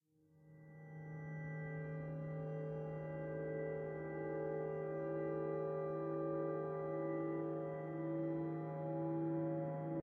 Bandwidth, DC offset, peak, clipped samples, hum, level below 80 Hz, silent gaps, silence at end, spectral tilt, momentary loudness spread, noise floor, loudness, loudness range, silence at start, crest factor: 3.4 kHz; under 0.1%; -30 dBFS; under 0.1%; none; -74 dBFS; none; 0 s; -10 dB/octave; 6 LU; -69 dBFS; -43 LUFS; 4 LU; 0.35 s; 12 dB